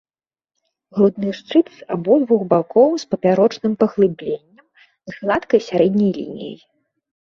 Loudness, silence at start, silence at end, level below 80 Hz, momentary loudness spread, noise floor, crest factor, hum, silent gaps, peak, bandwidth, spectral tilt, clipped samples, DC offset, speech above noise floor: -18 LUFS; 0.95 s; 0.85 s; -60 dBFS; 13 LU; under -90 dBFS; 16 dB; none; none; -2 dBFS; 7.2 kHz; -7.5 dB/octave; under 0.1%; under 0.1%; over 73 dB